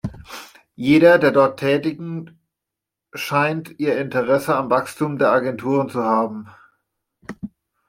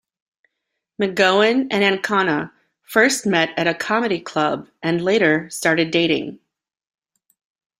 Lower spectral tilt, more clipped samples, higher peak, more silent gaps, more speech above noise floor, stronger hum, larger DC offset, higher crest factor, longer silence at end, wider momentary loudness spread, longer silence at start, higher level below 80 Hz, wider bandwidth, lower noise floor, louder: first, -6.5 dB/octave vs -4 dB/octave; neither; about the same, -2 dBFS vs -2 dBFS; neither; first, 66 dB vs 60 dB; neither; neither; about the same, 18 dB vs 18 dB; second, 0.4 s vs 1.45 s; first, 22 LU vs 7 LU; second, 0.05 s vs 1 s; first, -56 dBFS vs -62 dBFS; about the same, 16 kHz vs 15.5 kHz; first, -84 dBFS vs -79 dBFS; about the same, -19 LUFS vs -18 LUFS